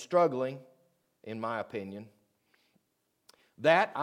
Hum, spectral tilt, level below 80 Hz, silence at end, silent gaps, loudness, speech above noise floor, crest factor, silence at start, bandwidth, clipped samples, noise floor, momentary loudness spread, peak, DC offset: none; -5.5 dB/octave; -88 dBFS; 0 s; none; -30 LUFS; 49 dB; 24 dB; 0 s; 12.5 kHz; under 0.1%; -78 dBFS; 22 LU; -10 dBFS; under 0.1%